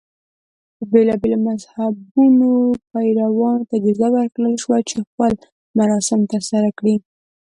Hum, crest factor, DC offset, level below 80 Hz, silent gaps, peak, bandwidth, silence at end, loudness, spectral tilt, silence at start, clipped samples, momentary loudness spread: none; 16 dB; under 0.1%; -54 dBFS; 2.11-2.15 s, 5.07-5.18 s, 5.52-5.74 s; -2 dBFS; 11.5 kHz; 0.5 s; -17 LUFS; -6 dB/octave; 0.8 s; under 0.1%; 9 LU